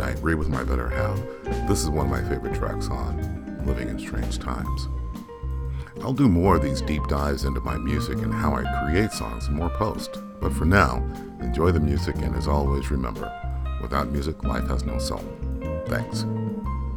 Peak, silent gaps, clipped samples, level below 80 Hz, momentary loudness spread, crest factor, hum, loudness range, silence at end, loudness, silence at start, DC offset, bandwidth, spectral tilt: -2 dBFS; none; under 0.1%; -30 dBFS; 11 LU; 22 dB; none; 4 LU; 0 s; -26 LUFS; 0 s; under 0.1%; 17 kHz; -6.5 dB/octave